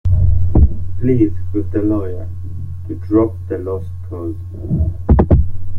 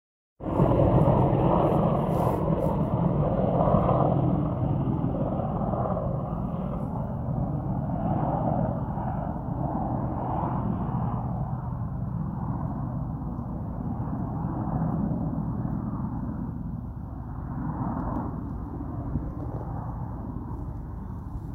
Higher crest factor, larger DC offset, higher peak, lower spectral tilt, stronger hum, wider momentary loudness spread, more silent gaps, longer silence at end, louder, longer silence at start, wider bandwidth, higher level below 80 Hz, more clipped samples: about the same, 14 dB vs 18 dB; neither; first, -2 dBFS vs -8 dBFS; about the same, -12 dB/octave vs -11 dB/octave; neither; about the same, 14 LU vs 12 LU; neither; about the same, 0 s vs 0 s; first, -17 LUFS vs -28 LUFS; second, 0.05 s vs 0.4 s; second, 2.9 kHz vs 3.9 kHz; first, -22 dBFS vs -38 dBFS; neither